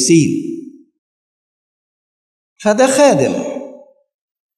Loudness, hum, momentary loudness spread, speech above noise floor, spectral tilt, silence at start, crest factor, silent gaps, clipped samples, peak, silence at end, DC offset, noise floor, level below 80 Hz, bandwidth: -14 LUFS; none; 19 LU; 28 dB; -4.5 dB/octave; 0 s; 16 dB; 0.98-2.56 s; under 0.1%; 0 dBFS; 0.8 s; under 0.1%; -39 dBFS; -68 dBFS; 13.5 kHz